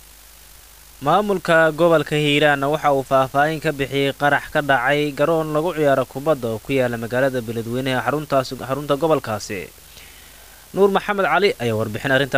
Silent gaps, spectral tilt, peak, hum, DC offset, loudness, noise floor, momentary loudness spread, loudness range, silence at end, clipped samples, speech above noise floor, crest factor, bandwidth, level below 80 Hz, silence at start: none; -5.5 dB/octave; -4 dBFS; none; 0.3%; -19 LUFS; -45 dBFS; 9 LU; 5 LU; 0 s; under 0.1%; 26 dB; 14 dB; 16 kHz; -50 dBFS; 1 s